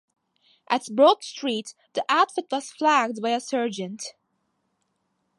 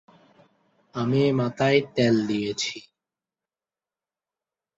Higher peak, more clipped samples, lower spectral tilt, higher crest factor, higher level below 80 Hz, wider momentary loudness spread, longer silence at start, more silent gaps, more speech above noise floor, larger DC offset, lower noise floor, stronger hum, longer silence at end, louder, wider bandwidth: first, -4 dBFS vs -8 dBFS; neither; second, -3 dB/octave vs -5.5 dB/octave; about the same, 20 dB vs 20 dB; second, -82 dBFS vs -64 dBFS; first, 14 LU vs 9 LU; second, 0.7 s vs 0.95 s; neither; second, 50 dB vs over 67 dB; neither; second, -74 dBFS vs under -90 dBFS; neither; second, 1.3 s vs 1.95 s; about the same, -24 LUFS vs -23 LUFS; first, 11.5 kHz vs 8 kHz